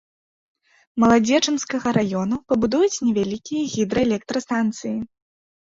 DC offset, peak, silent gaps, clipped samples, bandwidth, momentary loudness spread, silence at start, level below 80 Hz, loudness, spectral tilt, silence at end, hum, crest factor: under 0.1%; -4 dBFS; none; under 0.1%; 7.8 kHz; 10 LU; 0.95 s; -52 dBFS; -21 LUFS; -4.5 dB/octave; 0.6 s; none; 18 dB